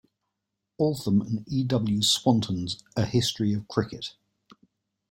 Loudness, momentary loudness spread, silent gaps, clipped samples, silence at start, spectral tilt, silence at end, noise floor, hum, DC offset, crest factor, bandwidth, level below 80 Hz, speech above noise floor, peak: -26 LUFS; 9 LU; none; under 0.1%; 0.8 s; -5 dB/octave; 1 s; -83 dBFS; none; under 0.1%; 20 dB; 16.5 kHz; -58 dBFS; 58 dB; -8 dBFS